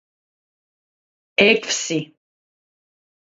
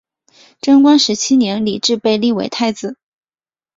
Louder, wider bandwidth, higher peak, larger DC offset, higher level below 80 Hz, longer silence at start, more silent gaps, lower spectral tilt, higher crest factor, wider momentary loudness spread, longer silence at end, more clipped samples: second, -18 LUFS vs -14 LUFS; about the same, 8 kHz vs 7.8 kHz; about the same, 0 dBFS vs -2 dBFS; neither; second, -64 dBFS vs -58 dBFS; first, 1.4 s vs 0.65 s; neither; second, -2.5 dB/octave vs -4 dB/octave; first, 24 dB vs 14 dB; about the same, 12 LU vs 11 LU; first, 1.2 s vs 0.85 s; neither